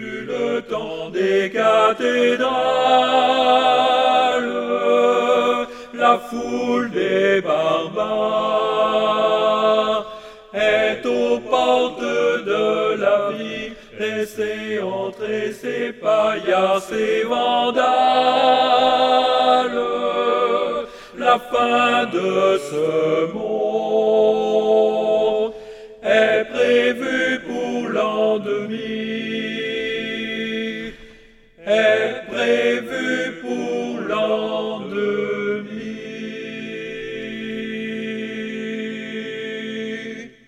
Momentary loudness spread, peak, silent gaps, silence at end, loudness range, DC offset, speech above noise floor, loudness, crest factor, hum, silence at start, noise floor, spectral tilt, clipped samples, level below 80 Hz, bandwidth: 12 LU; -2 dBFS; none; 0.2 s; 8 LU; under 0.1%; 30 dB; -19 LUFS; 18 dB; none; 0 s; -47 dBFS; -4.5 dB/octave; under 0.1%; -56 dBFS; 13 kHz